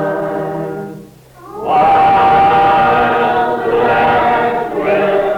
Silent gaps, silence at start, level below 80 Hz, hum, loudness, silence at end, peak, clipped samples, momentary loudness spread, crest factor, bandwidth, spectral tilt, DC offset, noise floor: none; 0 s; -42 dBFS; none; -12 LUFS; 0 s; -4 dBFS; under 0.1%; 13 LU; 10 dB; 10 kHz; -6.5 dB/octave; under 0.1%; -37 dBFS